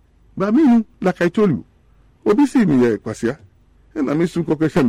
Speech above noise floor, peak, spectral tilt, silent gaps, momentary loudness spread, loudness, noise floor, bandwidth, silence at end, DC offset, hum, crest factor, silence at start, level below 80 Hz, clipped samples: 36 dB; -8 dBFS; -7.5 dB/octave; none; 10 LU; -18 LUFS; -53 dBFS; 11.5 kHz; 0 s; under 0.1%; none; 10 dB; 0.35 s; -50 dBFS; under 0.1%